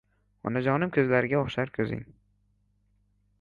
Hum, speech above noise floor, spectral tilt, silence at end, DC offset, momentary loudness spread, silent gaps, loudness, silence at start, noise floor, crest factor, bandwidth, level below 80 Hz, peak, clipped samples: 50 Hz at -55 dBFS; 42 dB; -8.5 dB/octave; 1.3 s; under 0.1%; 10 LU; none; -27 LUFS; 0.45 s; -69 dBFS; 20 dB; 7.2 kHz; -58 dBFS; -10 dBFS; under 0.1%